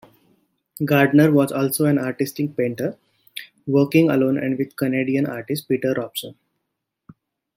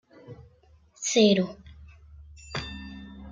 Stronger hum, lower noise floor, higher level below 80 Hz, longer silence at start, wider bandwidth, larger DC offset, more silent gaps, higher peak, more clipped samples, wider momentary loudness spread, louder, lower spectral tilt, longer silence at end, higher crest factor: neither; first, -79 dBFS vs -59 dBFS; second, -64 dBFS vs -52 dBFS; first, 0.8 s vs 0.3 s; first, 16.5 kHz vs 9.6 kHz; neither; neither; first, -4 dBFS vs -8 dBFS; neither; second, 15 LU vs 28 LU; first, -20 LUFS vs -25 LUFS; first, -6.5 dB/octave vs -4 dB/octave; first, 1.25 s vs 0 s; about the same, 18 dB vs 22 dB